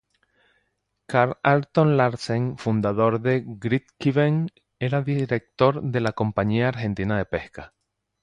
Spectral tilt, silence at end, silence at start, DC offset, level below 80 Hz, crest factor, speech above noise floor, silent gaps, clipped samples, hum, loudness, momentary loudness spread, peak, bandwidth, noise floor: -8 dB/octave; 0.55 s; 1.1 s; under 0.1%; -52 dBFS; 20 dB; 51 dB; none; under 0.1%; none; -23 LUFS; 7 LU; -4 dBFS; 10.5 kHz; -74 dBFS